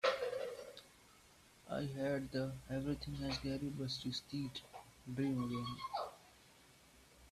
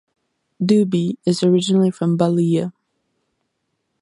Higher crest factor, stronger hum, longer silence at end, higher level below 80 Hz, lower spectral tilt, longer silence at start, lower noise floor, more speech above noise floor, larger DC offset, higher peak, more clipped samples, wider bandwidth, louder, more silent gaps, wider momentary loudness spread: first, 22 dB vs 16 dB; neither; second, 0 s vs 1.3 s; about the same, -62 dBFS vs -66 dBFS; second, -5.5 dB/octave vs -7 dB/octave; second, 0.05 s vs 0.6 s; second, -65 dBFS vs -73 dBFS; second, 24 dB vs 56 dB; neither; second, -22 dBFS vs -2 dBFS; neither; first, 14.5 kHz vs 11 kHz; second, -42 LUFS vs -18 LUFS; neither; first, 23 LU vs 6 LU